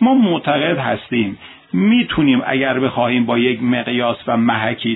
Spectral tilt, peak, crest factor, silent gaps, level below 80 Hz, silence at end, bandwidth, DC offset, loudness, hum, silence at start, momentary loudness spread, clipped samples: -10 dB/octave; 0 dBFS; 16 dB; none; -50 dBFS; 0 s; 4.1 kHz; under 0.1%; -16 LUFS; none; 0 s; 6 LU; under 0.1%